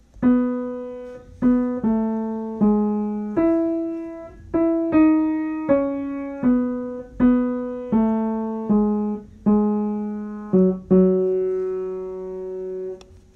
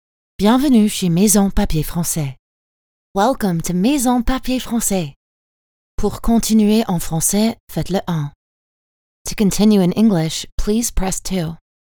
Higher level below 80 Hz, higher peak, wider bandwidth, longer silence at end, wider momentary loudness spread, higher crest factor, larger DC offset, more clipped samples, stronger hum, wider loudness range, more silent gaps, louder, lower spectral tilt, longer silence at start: second, -48 dBFS vs -30 dBFS; second, -6 dBFS vs 0 dBFS; second, 3.8 kHz vs over 20 kHz; second, 0.2 s vs 0.35 s; first, 13 LU vs 10 LU; about the same, 16 dB vs 18 dB; neither; neither; neither; about the same, 2 LU vs 2 LU; second, none vs 2.39-3.15 s, 5.16-5.98 s, 7.60-7.67 s, 8.35-9.25 s, 10.52-10.58 s; second, -22 LUFS vs -17 LUFS; first, -11 dB/octave vs -5 dB/octave; second, 0.15 s vs 0.4 s